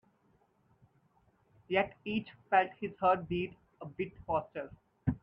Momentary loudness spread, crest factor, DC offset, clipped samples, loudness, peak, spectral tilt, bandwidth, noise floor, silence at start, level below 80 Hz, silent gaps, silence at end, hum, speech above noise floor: 15 LU; 22 dB; under 0.1%; under 0.1%; -34 LUFS; -14 dBFS; -9 dB/octave; 5.4 kHz; -71 dBFS; 1.7 s; -60 dBFS; none; 0.05 s; none; 37 dB